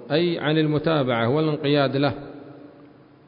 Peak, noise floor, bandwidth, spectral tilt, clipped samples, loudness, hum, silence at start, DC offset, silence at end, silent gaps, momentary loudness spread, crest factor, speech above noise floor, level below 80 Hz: -8 dBFS; -49 dBFS; 5.2 kHz; -11.5 dB/octave; under 0.1%; -22 LUFS; none; 0 s; under 0.1%; 0.6 s; none; 12 LU; 14 dB; 28 dB; -58 dBFS